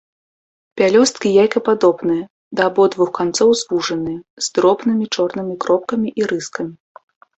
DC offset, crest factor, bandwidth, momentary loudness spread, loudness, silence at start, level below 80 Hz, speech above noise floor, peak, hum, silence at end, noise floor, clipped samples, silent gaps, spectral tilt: under 0.1%; 16 dB; 8.4 kHz; 10 LU; -17 LUFS; 0.75 s; -58 dBFS; over 74 dB; -2 dBFS; none; 0.65 s; under -90 dBFS; under 0.1%; 2.30-2.51 s, 4.30-4.37 s; -4 dB/octave